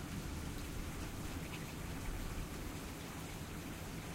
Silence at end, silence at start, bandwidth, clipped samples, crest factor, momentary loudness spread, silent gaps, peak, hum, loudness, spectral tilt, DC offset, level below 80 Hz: 0 s; 0 s; 16 kHz; under 0.1%; 14 dB; 2 LU; none; -30 dBFS; none; -46 LUFS; -4.5 dB/octave; under 0.1%; -48 dBFS